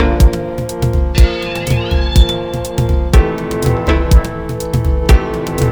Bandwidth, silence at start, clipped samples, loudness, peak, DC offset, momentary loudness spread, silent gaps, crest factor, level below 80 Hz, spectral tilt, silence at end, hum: over 20 kHz; 0 s; 0.4%; -15 LUFS; 0 dBFS; under 0.1%; 7 LU; none; 12 dB; -14 dBFS; -6 dB/octave; 0 s; none